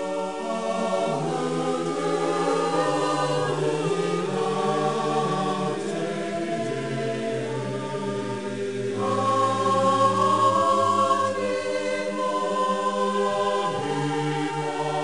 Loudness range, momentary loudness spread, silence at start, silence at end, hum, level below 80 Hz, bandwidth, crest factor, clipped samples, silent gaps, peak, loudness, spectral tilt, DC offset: 5 LU; 8 LU; 0 s; 0 s; none; -66 dBFS; 10.5 kHz; 16 dB; under 0.1%; none; -8 dBFS; -25 LUFS; -5 dB/octave; 0.4%